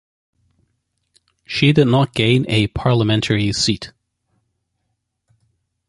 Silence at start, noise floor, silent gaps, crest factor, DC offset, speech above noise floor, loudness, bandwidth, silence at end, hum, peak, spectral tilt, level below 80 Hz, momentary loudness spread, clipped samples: 1.5 s; -73 dBFS; none; 18 dB; under 0.1%; 57 dB; -17 LUFS; 11.5 kHz; 2 s; none; -2 dBFS; -5.5 dB/octave; -44 dBFS; 8 LU; under 0.1%